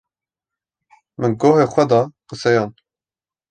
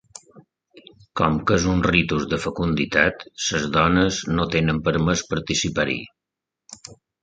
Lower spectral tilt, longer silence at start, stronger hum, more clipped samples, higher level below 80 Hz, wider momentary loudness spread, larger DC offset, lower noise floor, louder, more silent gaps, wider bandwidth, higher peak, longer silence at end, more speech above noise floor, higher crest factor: first, -6.5 dB/octave vs -4.5 dB/octave; first, 1.2 s vs 0.35 s; neither; neither; second, -60 dBFS vs -40 dBFS; about the same, 10 LU vs 9 LU; neither; first, under -90 dBFS vs -86 dBFS; first, -17 LUFS vs -21 LUFS; neither; about the same, 9.2 kHz vs 9.2 kHz; about the same, -2 dBFS vs -2 dBFS; first, 0.8 s vs 0.3 s; first, over 74 dB vs 65 dB; about the same, 18 dB vs 20 dB